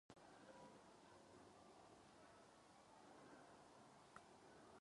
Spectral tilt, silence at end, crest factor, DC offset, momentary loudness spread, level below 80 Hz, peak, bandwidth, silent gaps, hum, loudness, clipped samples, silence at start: -4 dB/octave; 0 s; 24 dB; under 0.1%; 3 LU; -88 dBFS; -42 dBFS; 11 kHz; none; none; -66 LUFS; under 0.1%; 0.1 s